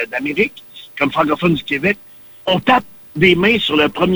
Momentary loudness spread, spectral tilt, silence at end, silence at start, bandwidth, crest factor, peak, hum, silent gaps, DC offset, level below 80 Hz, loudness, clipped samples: 12 LU; -6 dB/octave; 0 s; 0 s; over 20 kHz; 14 dB; -2 dBFS; none; none; under 0.1%; -46 dBFS; -16 LUFS; under 0.1%